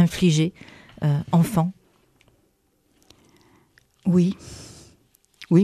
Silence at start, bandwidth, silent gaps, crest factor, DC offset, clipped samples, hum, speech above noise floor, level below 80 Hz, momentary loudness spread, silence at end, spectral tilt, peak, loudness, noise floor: 0 s; 14 kHz; none; 18 dB; under 0.1%; under 0.1%; none; 45 dB; -54 dBFS; 24 LU; 0 s; -7 dB/octave; -6 dBFS; -22 LUFS; -66 dBFS